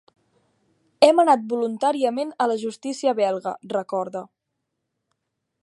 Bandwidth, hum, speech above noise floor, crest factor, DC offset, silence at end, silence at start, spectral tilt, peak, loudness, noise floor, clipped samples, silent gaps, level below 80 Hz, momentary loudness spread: 11.5 kHz; none; 58 dB; 22 dB; under 0.1%; 1.4 s; 1 s; -4.5 dB/octave; -2 dBFS; -22 LUFS; -79 dBFS; under 0.1%; none; -80 dBFS; 12 LU